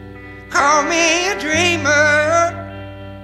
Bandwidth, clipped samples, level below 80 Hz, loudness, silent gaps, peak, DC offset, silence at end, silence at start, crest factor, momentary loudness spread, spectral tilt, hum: 14.5 kHz; under 0.1%; -44 dBFS; -14 LUFS; none; 0 dBFS; under 0.1%; 0 s; 0 s; 16 dB; 20 LU; -2.5 dB/octave; 60 Hz at -45 dBFS